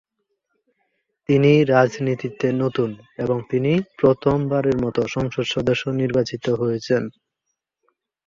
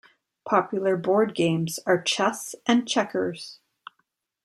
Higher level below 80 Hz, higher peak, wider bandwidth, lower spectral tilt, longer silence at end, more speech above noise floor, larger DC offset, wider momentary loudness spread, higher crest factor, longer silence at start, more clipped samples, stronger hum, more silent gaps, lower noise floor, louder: first, -52 dBFS vs -72 dBFS; about the same, -4 dBFS vs -6 dBFS; second, 7.6 kHz vs 14.5 kHz; first, -7 dB/octave vs -4.5 dB/octave; first, 1.15 s vs 0.9 s; first, 59 dB vs 50 dB; neither; about the same, 9 LU vs 9 LU; about the same, 18 dB vs 20 dB; first, 1.3 s vs 0.45 s; neither; neither; neither; first, -79 dBFS vs -74 dBFS; first, -20 LUFS vs -24 LUFS